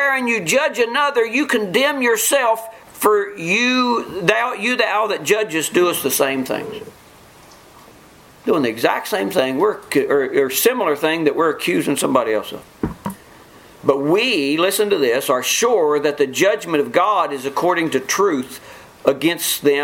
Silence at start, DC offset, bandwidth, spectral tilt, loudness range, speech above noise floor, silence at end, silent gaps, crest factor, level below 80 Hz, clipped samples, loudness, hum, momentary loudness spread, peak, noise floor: 0 s; under 0.1%; 17 kHz; -3 dB/octave; 4 LU; 28 dB; 0 s; none; 18 dB; -54 dBFS; under 0.1%; -17 LUFS; none; 7 LU; 0 dBFS; -45 dBFS